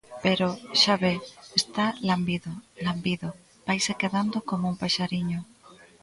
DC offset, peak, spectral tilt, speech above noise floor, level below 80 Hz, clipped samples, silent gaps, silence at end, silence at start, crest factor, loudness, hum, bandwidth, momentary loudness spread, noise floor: under 0.1%; -4 dBFS; -4.5 dB/octave; 26 dB; -60 dBFS; under 0.1%; none; 0.3 s; 0.1 s; 22 dB; -26 LUFS; none; 11.5 kHz; 11 LU; -53 dBFS